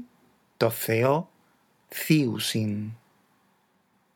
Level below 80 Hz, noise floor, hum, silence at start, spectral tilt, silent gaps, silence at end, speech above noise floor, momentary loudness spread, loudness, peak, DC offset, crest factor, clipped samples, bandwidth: -78 dBFS; -68 dBFS; none; 0 s; -5.5 dB/octave; none; 1.2 s; 43 dB; 14 LU; -26 LUFS; -6 dBFS; under 0.1%; 22 dB; under 0.1%; over 20 kHz